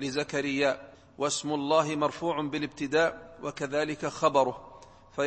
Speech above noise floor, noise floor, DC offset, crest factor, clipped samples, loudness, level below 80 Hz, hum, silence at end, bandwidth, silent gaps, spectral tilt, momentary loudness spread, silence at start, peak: 23 dB; -51 dBFS; under 0.1%; 20 dB; under 0.1%; -29 LUFS; -62 dBFS; none; 0 s; 8.8 kHz; none; -4 dB/octave; 11 LU; 0 s; -8 dBFS